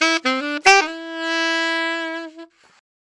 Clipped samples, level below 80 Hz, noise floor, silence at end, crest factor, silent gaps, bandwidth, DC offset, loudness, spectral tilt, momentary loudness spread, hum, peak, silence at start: under 0.1%; -60 dBFS; -43 dBFS; 0.75 s; 18 dB; none; 11.5 kHz; under 0.1%; -18 LUFS; 0.5 dB/octave; 15 LU; none; -2 dBFS; 0 s